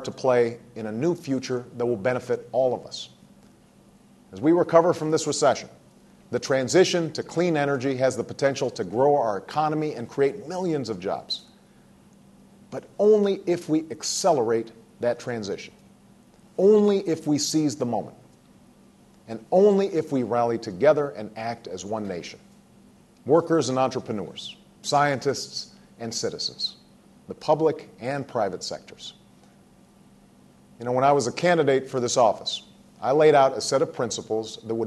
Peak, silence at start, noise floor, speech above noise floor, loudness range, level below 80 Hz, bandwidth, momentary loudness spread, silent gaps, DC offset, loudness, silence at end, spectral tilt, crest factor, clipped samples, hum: -2 dBFS; 0 s; -55 dBFS; 31 dB; 6 LU; -66 dBFS; 12.5 kHz; 16 LU; none; under 0.1%; -24 LUFS; 0 s; -4.5 dB/octave; 22 dB; under 0.1%; none